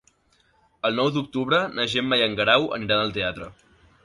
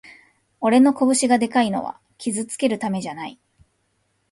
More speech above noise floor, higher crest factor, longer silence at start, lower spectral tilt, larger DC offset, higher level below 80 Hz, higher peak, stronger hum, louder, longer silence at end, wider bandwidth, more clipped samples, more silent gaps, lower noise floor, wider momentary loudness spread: second, 40 dB vs 49 dB; about the same, 20 dB vs 16 dB; first, 0.85 s vs 0.05 s; about the same, -5 dB/octave vs -4 dB/octave; neither; first, -56 dBFS vs -64 dBFS; about the same, -4 dBFS vs -4 dBFS; neither; about the same, -22 LUFS vs -20 LUFS; second, 0.5 s vs 1 s; about the same, 11.5 kHz vs 11.5 kHz; neither; neither; second, -63 dBFS vs -69 dBFS; second, 9 LU vs 16 LU